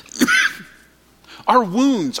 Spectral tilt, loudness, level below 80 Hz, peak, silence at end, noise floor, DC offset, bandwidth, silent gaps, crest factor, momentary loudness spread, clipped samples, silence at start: -3 dB/octave; -17 LUFS; -58 dBFS; -2 dBFS; 0 s; -51 dBFS; under 0.1%; 17.5 kHz; none; 18 dB; 9 LU; under 0.1%; 0.15 s